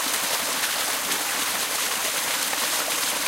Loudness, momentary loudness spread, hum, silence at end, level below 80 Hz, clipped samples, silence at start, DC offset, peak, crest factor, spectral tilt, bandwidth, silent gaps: -23 LUFS; 1 LU; none; 0 s; -62 dBFS; under 0.1%; 0 s; under 0.1%; -8 dBFS; 18 dB; 1 dB/octave; 16 kHz; none